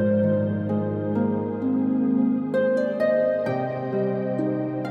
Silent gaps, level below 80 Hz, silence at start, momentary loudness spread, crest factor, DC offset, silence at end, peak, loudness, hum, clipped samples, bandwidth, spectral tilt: none; -66 dBFS; 0 s; 4 LU; 12 dB; under 0.1%; 0 s; -10 dBFS; -24 LUFS; none; under 0.1%; 5.4 kHz; -10 dB/octave